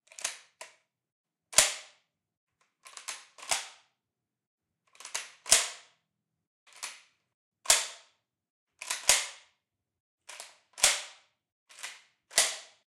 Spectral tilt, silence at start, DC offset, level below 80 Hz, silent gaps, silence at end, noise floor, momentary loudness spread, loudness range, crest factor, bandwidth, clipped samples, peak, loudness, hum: 2.5 dB/octave; 0.2 s; under 0.1%; -68 dBFS; 1.12-1.24 s, 2.37-2.47 s, 4.47-4.58 s, 6.47-6.66 s, 7.34-7.52 s, 8.50-8.67 s, 10.00-10.18 s, 11.52-11.66 s; 0.25 s; -88 dBFS; 23 LU; 4 LU; 30 dB; 16 kHz; under 0.1%; -4 dBFS; -27 LUFS; none